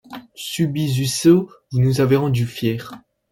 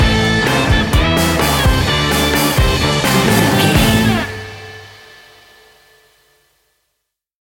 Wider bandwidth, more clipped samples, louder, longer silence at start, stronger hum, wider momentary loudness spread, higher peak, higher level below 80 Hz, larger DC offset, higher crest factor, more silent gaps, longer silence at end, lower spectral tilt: about the same, 17 kHz vs 17 kHz; neither; second, -19 LUFS vs -13 LUFS; about the same, 0.1 s vs 0 s; neither; about the same, 15 LU vs 14 LU; about the same, -2 dBFS vs 0 dBFS; second, -52 dBFS vs -24 dBFS; neither; about the same, 16 dB vs 16 dB; neither; second, 0.35 s vs 2.6 s; first, -6 dB/octave vs -4.5 dB/octave